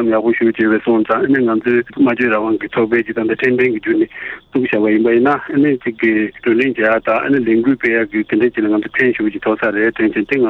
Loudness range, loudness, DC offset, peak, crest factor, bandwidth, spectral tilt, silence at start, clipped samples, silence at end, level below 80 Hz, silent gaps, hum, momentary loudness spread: 1 LU; -15 LUFS; under 0.1%; -2 dBFS; 14 dB; 4.4 kHz; -8.5 dB/octave; 0 s; under 0.1%; 0 s; -52 dBFS; none; none; 4 LU